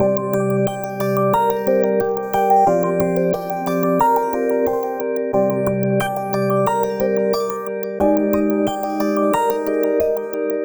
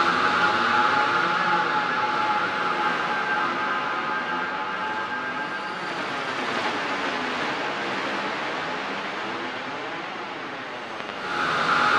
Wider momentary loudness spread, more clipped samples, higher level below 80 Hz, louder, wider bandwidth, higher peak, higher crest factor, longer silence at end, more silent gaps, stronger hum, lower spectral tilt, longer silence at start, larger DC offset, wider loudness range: second, 6 LU vs 11 LU; neither; first, -50 dBFS vs -68 dBFS; first, -19 LUFS vs -25 LUFS; first, over 20 kHz vs 12.5 kHz; first, -4 dBFS vs -10 dBFS; about the same, 14 dB vs 16 dB; about the same, 0 s vs 0 s; neither; neither; first, -7 dB/octave vs -3.5 dB/octave; about the same, 0 s vs 0 s; neither; second, 2 LU vs 7 LU